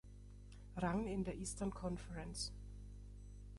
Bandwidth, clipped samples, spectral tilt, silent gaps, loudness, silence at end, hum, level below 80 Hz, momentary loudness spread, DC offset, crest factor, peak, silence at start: 11.5 kHz; under 0.1%; -5 dB/octave; none; -44 LUFS; 0 s; 50 Hz at -50 dBFS; -54 dBFS; 18 LU; under 0.1%; 18 dB; -28 dBFS; 0.05 s